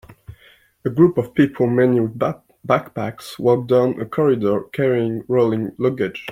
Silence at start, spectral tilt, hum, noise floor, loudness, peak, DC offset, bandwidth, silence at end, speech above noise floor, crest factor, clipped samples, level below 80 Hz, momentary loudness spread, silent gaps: 0.1 s; -8 dB/octave; none; -52 dBFS; -19 LUFS; -2 dBFS; under 0.1%; 15.5 kHz; 0 s; 33 dB; 18 dB; under 0.1%; -56 dBFS; 9 LU; none